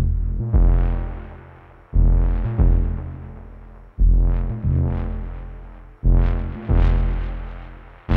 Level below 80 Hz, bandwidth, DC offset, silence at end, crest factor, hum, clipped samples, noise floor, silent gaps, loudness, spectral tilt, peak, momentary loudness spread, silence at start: -20 dBFS; 3.4 kHz; under 0.1%; 0 s; 14 dB; none; under 0.1%; -44 dBFS; none; -22 LUFS; -11 dB/octave; -6 dBFS; 21 LU; 0 s